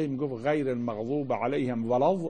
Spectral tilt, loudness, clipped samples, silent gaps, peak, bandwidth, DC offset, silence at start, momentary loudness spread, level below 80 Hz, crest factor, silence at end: -8 dB/octave; -29 LUFS; under 0.1%; none; -12 dBFS; 9.4 kHz; 0.2%; 0 s; 5 LU; -64 dBFS; 16 dB; 0 s